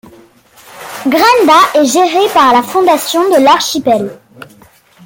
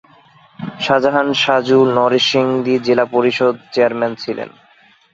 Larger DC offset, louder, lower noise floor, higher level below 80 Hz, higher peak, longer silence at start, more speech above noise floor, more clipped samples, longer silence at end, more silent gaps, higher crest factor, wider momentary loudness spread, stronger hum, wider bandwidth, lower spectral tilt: neither; first, -9 LUFS vs -15 LUFS; second, -43 dBFS vs -50 dBFS; first, -54 dBFS vs -60 dBFS; about the same, 0 dBFS vs 0 dBFS; first, 0.75 s vs 0.6 s; about the same, 34 dB vs 36 dB; neither; about the same, 0.6 s vs 0.65 s; neither; second, 10 dB vs 16 dB; about the same, 10 LU vs 12 LU; neither; first, 17 kHz vs 7.8 kHz; second, -2.5 dB/octave vs -5 dB/octave